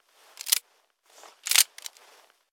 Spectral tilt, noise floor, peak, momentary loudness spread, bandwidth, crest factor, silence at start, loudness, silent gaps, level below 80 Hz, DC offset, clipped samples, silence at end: 7 dB/octave; -66 dBFS; -2 dBFS; 21 LU; 16 kHz; 30 dB; 0.45 s; -23 LUFS; none; under -90 dBFS; under 0.1%; under 0.1%; 0.65 s